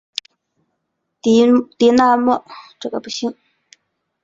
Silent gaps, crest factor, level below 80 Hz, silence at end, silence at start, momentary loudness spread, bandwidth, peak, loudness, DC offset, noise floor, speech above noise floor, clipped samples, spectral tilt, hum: none; 18 dB; -58 dBFS; 0.9 s; 1.25 s; 16 LU; 7.8 kHz; 0 dBFS; -16 LUFS; under 0.1%; -74 dBFS; 58 dB; under 0.1%; -4.5 dB/octave; none